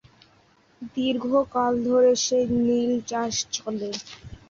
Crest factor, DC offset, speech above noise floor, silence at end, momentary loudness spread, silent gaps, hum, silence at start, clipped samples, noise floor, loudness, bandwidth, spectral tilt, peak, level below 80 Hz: 16 dB; under 0.1%; 36 dB; 0.15 s; 14 LU; none; none; 0.8 s; under 0.1%; -59 dBFS; -23 LUFS; 7.6 kHz; -3.5 dB/octave; -10 dBFS; -56 dBFS